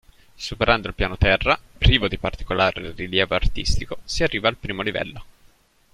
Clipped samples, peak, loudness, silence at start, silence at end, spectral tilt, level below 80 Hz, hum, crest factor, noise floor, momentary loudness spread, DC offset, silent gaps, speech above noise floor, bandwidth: under 0.1%; -2 dBFS; -22 LUFS; 0.4 s; 0.7 s; -4.5 dB/octave; -30 dBFS; none; 20 dB; -56 dBFS; 11 LU; under 0.1%; none; 34 dB; 13 kHz